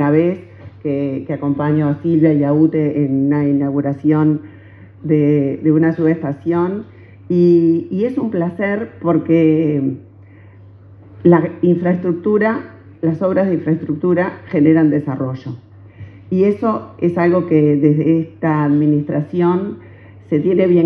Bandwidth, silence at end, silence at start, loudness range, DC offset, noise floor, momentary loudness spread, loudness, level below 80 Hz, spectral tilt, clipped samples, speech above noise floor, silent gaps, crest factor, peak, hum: 5 kHz; 0 s; 0 s; 2 LU; under 0.1%; -41 dBFS; 9 LU; -16 LUFS; -60 dBFS; -11 dB/octave; under 0.1%; 26 dB; none; 16 dB; 0 dBFS; none